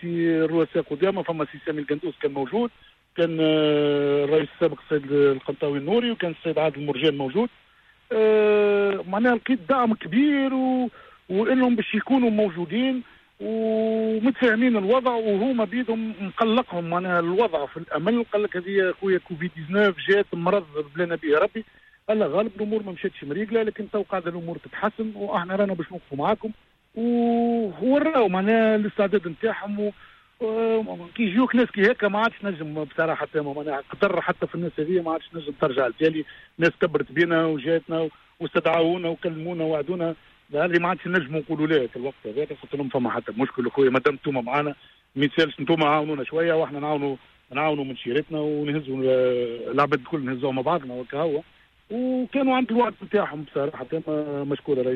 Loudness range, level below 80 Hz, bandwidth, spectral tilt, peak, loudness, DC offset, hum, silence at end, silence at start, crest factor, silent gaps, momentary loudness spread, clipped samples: 3 LU; -62 dBFS; 6.4 kHz; -8 dB/octave; -8 dBFS; -24 LUFS; under 0.1%; none; 0 s; 0 s; 16 dB; none; 10 LU; under 0.1%